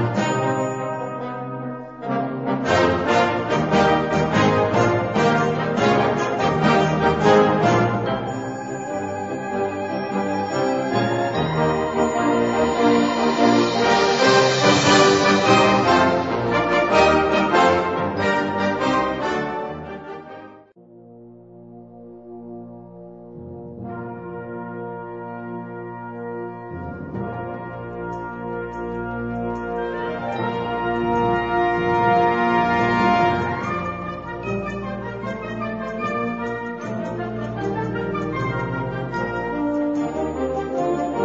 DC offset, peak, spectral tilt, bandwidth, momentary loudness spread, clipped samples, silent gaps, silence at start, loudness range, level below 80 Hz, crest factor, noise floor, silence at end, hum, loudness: under 0.1%; -2 dBFS; -5.5 dB/octave; 8 kHz; 17 LU; under 0.1%; none; 0 s; 17 LU; -46 dBFS; 18 dB; -47 dBFS; 0 s; none; -20 LUFS